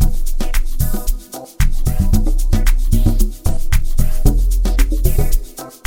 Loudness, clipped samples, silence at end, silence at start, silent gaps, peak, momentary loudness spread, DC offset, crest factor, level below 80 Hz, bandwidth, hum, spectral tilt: -20 LUFS; under 0.1%; 0.15 s; 0 s; none; 0 dBFS; 7 LU; under 0.1%; 12 dB; -14 dBFS; 17 kHz; none; -5.5 dB/octave